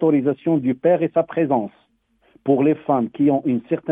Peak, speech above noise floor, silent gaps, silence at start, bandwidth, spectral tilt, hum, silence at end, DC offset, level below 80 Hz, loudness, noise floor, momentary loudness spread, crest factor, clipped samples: -4 dBFS; 43 dB; none; 0 s; 3.7 kHz; -11 dB/octave; none; 0 s; under 0.1%; -66 dBFS; -20 LUFS; -62 dBFS; 5 LU; 14 dB; under 0.1%